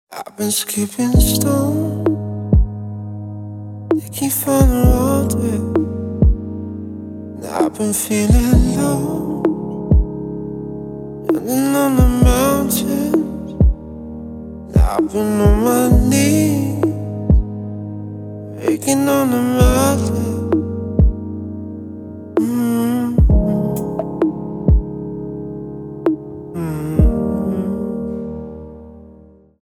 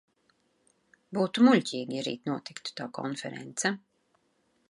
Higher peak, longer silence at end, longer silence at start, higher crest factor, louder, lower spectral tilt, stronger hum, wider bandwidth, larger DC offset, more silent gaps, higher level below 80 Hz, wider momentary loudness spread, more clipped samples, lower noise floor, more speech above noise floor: first, 0 dBFS vs -8 dBFS; second, 0.5 s vs 0.95 s; second, 0.1 s vs 1.1 s; second, 16 dB vs 22 dB; first, -17 LUFS vs -29 LUFS; first, -6 dB/octave vs -4.5 dB/octave; neither; first, 16.5 kHz vs 11.5 kHz; neither; neither; first, -22 dBFS vs -80 dBFS; about the same, 16 LU vs 15 LU; neither; second, -45 dBFS vs -72 dBFS; second, 30 dB vs 43 dB